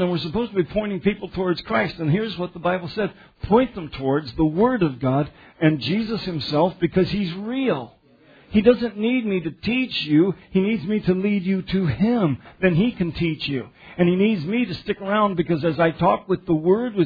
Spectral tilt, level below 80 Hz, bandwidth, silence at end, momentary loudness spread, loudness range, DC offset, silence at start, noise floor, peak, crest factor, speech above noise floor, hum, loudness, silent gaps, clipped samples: -9 dB/octave; -46 dBFS; 5 kHz; 0 s; 7 LU; 2 LU; under 0.1%; 0 s; -52 dBFS; -2 dBFS; 20 dB; 31 dB; none; -22 LUFS; none; under 0.1%